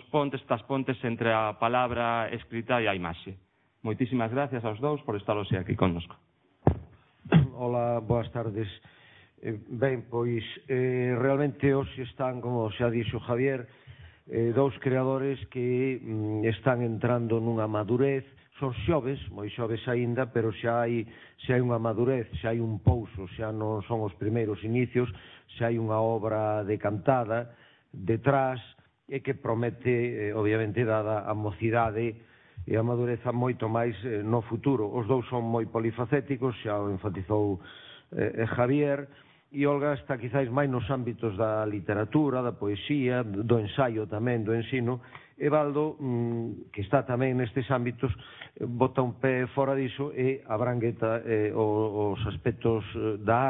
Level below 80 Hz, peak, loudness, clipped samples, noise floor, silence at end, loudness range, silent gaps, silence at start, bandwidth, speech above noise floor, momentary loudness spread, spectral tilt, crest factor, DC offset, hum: -54 dBFS; -4 dBFS; -29 LUFS; under 0.1%; -50 dBFS; 0 s; 2 LU; none; 0.15 s; 4 kHz; 21 dB; 9 LU; -11.5 dB/octave; 24 dB; under 0.1%; none